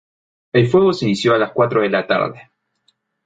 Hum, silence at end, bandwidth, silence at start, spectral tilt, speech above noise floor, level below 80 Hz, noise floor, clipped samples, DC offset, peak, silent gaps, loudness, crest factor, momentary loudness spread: none; 0.85 s; 9 kHz; 0.55 s; -6.5 dB/octave; 49 dB; -54 dBFS; -64 dBFS; under 0.1%; under 0.1%; -2 dBFS; none; -16 LUFS; 16 dB; 5 LU